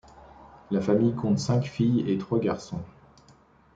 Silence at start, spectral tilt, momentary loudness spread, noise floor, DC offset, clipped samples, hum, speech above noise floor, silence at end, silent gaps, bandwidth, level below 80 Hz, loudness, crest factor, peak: 0.4 s; -7.5 dB/octave; 12 LU; -57 dBFS; under 0.1%; under 0.1%; none; 32 dB; 0.85 s; none; 9 kHz; -58 dBFS; -26 LUFS; 16 dB; -10 dBFS